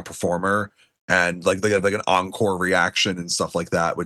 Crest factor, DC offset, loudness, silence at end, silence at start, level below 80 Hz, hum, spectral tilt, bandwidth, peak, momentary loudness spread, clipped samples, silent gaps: 18 dB; under 0.1%; -21 LUFS; 0 s; 0 s; -60 dBFS; none; -3.5 dB/octave; 12.5 kHz; -4 dBFS; 5 LU; under 0.1%; 1.01-1.08 s